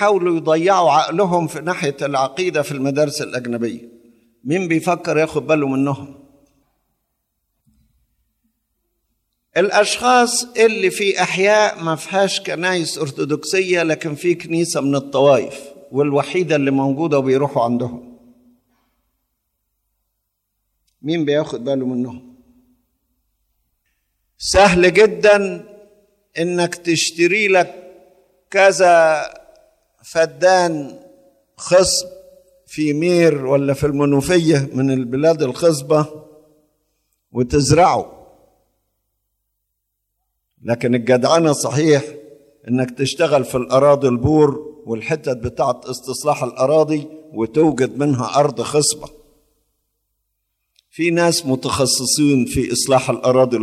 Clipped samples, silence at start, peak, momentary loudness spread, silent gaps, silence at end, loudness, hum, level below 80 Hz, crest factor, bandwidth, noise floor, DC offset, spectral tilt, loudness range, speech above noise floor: under 0.1%; 0 s; 0 dBFS; 11 LU; none; 0 s; -17 LUFS; none; -46 dBFS; 18 dB; 14.5 kHz; -75 dBFS; under 0.1%; -4.5 dB/octave; 8 LU; 58 dB